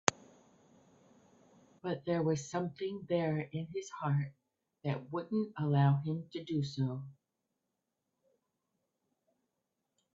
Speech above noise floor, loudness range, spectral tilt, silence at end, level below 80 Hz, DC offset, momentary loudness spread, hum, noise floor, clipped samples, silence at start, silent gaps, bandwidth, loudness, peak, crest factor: 52 dB; 8 LU; -6 dB/octave; 3.05 s; -74 dBFS; under 0.1%; 12 LU; none; -86 dBFS; under 0.1%; 0.05 s; none; 8 kHz; -36 LUFS; -2 dBFS; 36 dB